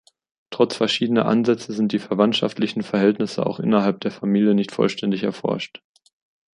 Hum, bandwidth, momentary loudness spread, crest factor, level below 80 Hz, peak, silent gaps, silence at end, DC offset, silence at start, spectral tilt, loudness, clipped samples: none; 10.5 kHz; 7 LU; 18 dB; -64 dBFS; -2 dBFS; none; 0.9 s; under 0.1%; 0.5 s; -6 dB/octave; -21 LUFS; under 0.1%